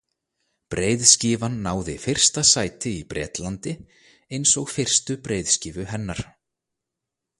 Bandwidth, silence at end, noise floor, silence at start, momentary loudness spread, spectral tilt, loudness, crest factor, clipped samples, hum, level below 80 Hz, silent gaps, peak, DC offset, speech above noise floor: 12.5 kHz; 1.15 s; -84 dBFS; 0.7 s; 17 LU; -2.5 dB/octave; -20 LUFS; 24 dB; under 0.1%; none; -48 dBFS; none; 0 dBFS; under 0.1%; 61 dB